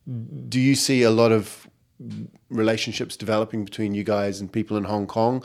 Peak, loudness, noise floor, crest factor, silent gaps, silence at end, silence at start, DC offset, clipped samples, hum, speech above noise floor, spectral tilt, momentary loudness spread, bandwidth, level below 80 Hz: -4 dBFS; -23 LUFS; -43 dBFS; 20 dB; none; 0 s; 0.05 s; under 0.1%; under 0.1%; none; 20 dB; -5 dB/octave; 19 LU; 16 kHz; -64 dBFS